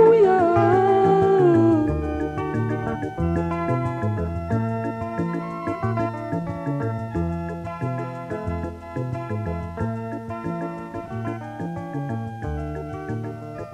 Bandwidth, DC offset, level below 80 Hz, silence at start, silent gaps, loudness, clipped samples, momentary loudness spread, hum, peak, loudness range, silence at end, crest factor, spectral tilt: 9.6 kHz; under 0.1%; -42 dBFS; 0 s; none; -24 LUFS; under 0.1%; 14 LU; none; -6 dBFS; 10 LU; 0 s; 16 dB; -9 dB/octave